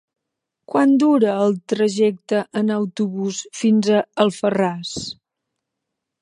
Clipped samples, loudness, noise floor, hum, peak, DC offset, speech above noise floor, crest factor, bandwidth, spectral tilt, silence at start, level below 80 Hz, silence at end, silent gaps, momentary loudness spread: under 0.1%; -19 LUFS; -81 dBFS; none; -2 dBFS; under 0.1%; 62 dB; 18 dB; 11 kHz; -5.5 dB/octave; 0.75 s; -64 dBFS; 1.1 s; none; 11 LU